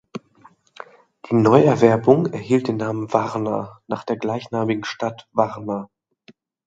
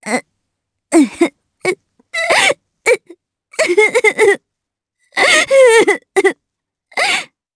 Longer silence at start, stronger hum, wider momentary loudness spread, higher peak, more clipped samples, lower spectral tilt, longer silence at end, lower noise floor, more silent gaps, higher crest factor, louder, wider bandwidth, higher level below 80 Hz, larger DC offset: about the same, 0.15 s vs 0.05 s; neither; about the same, 15 LU vs 13 LU; about the same, 0 dBFS vs 0 dBFS; neither; first, -7.5 dB/octave vs -1.5 dB/octave; first, 0.85 s vs 0.3 s; second, -53 dBFS vs -80 dBFS; neither; first, 20 dB vs 14 dB; second, -20 LUFS vs -13 LUFS; second, 7.8 kHz vs 11 kHz; about the same, -62 dBFS vs -60 dBFS; neither